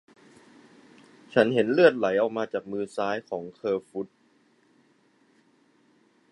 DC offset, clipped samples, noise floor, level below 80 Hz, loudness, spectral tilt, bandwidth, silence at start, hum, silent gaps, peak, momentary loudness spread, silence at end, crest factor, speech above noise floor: under 0.1%; under 0.1%; -64 dBFS; -74 dBFS; -26 LUFS; -6.5 dB/octave; 11 kHz; 1.3 s; none; none; -4 dBFS; 16 LU; 2.25 s; 24 dB; 39 dB